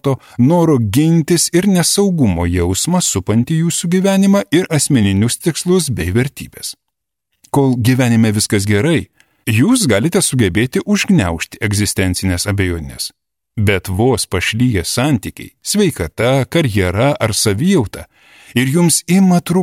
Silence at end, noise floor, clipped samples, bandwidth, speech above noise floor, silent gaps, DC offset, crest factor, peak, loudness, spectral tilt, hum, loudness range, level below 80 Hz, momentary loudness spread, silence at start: 0 s; -77 dBFS; under 0.1%; 16 kHz; 64 dB; none; under 0.1%; 14 dB; 0 dBFS; -14 LUFS; -5 dB/octave; none; 3 LU; -38 dBFS; 8 LU; 0.05 s